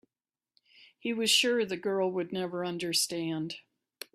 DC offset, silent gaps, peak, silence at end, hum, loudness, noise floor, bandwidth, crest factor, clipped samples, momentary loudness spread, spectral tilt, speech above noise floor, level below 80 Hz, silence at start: under 0.1%; none; -12 dBFS; 0.55 s; none; -30 LUFS; under -90 dBFS; 15.5 kHz; 20 dB; under 0.1%; 15 LU; -2.5 dB/octave; over 60 dB; -78 dBFS; 0.8 s